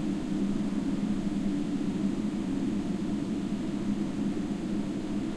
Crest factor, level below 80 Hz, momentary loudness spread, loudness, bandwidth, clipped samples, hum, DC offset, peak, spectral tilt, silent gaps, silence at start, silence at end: 12 dB; -46 dBFS; 2 LU; -31 LUFS; 11.5 kHz; under 0.1%; none; under 0.1%; -18 dBFS; -7 dB/octave; none; 0 s; 0 s